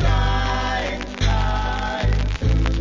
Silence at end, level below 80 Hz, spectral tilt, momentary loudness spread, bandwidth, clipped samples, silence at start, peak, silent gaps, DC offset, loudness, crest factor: 0 s; -22 dBFS; -5.5 dB/octave; 4 LU; 7.6 kHz; under 0.1%; 0 s; -4 dBFS; none; under 0.1%; -22 LUFS; 16 dB